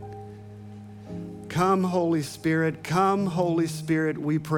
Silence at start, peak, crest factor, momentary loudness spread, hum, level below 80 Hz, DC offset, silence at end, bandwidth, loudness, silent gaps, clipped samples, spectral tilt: 0 s; -8 dBFS; 18 dB; 20 LU; none; -60 dBFS; under 0.1%; 0 s; 18.5 kHz; -25 LUFS; none; under 0.1%; -6.5 dB/octave